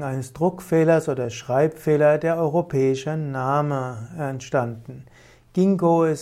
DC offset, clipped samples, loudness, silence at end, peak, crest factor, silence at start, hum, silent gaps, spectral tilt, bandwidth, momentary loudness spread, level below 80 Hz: under 0.1%; under 0.1%; -22 LUFS; 0 s; -8 dBFS; 14 dB; 0 s; none; none; -7.5 dB/octave; 15.5 kHz; 12 LU; -58 dBFS